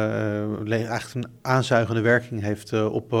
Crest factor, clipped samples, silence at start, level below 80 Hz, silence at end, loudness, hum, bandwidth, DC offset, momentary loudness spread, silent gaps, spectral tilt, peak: 18 dB; under 0.1%; 0 s; -60 dBFS; 0 s; -24 LUFS; none; 15 kHz; under 0.1%; 8 LU; none; -6.5 dB/octave; -4 dBFS